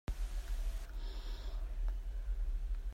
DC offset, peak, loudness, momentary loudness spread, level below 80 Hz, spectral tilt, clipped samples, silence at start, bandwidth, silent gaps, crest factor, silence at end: under 0.1%; -28 dBFS; -44 LUFS; 4 LU; -38 dBFS; -5 dB/octave; under 0.1%; 0.1 s; 13 kHz; none; 10 dB; 0 s